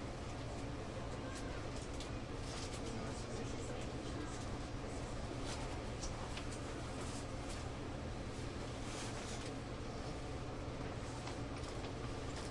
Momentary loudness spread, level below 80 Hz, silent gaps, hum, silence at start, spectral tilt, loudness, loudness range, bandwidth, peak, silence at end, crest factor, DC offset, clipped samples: 2 LU; -50 dBFS; none; none; 0 s; -5 dB/octave; -45 LUFS; 1 LU; 11.5 kHz; -30 dBFS; 0 s; 14 dB; under 0.1%; under 0.1%